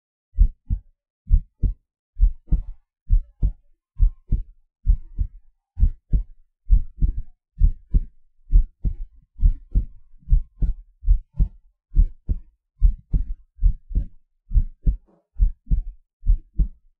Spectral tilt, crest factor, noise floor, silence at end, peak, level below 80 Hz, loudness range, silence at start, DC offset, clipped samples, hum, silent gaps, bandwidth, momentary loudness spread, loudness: -12.5 dB/octave; 18 dB; -48 dBFS; 0.25 s; -4 dBFS; -22 dBFS; 2 LU; 0.35 s; under 0.1%; under 0.1%; none; 1.10-1.25 s, 1.99-2.13 s, 3.01-3.06 s, 16.13-16.20 s; 0.6 kHz; 12 LU; -27 LUFS